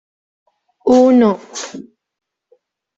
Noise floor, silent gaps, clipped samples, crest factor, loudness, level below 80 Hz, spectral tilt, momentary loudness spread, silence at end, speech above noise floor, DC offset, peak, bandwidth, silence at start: -58 dBFS; none; under 0.1%; 14 dB; -13 LUFS; -60 dBFS; -5.5 dB/octave; 20 LU; 1.15 s; 45 dB; under 0.1%; -2 dBFS; 8 kHz; 0.85 s